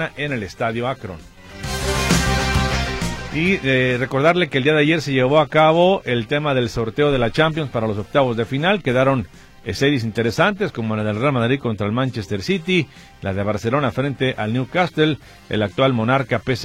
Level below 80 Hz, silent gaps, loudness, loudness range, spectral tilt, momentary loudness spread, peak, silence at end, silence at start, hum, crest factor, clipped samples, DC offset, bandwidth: -36 dBFS; none; -19 LUFS; 5 LU; -5.5 dB/octave; 9 LU; -2 dBFS; 0 s; 0 s; none; 18 dB; under 0.1%; under 0.1%; 16.5 kHz